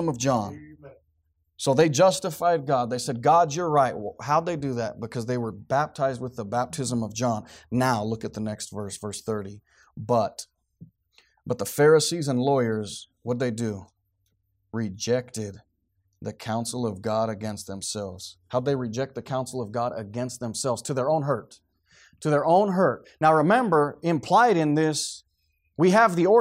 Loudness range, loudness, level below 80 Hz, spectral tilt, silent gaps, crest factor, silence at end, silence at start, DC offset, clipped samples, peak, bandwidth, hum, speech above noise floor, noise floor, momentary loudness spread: 9 LU; -25 LUFS; -64 dBFS; -5 dB/octave; none; 18 dB; 0 s; 0 s; under 0.1%; under 0.1%; -8 dBFS; 16 kHz; none; 48 dB; -73 dBFS; 14 LU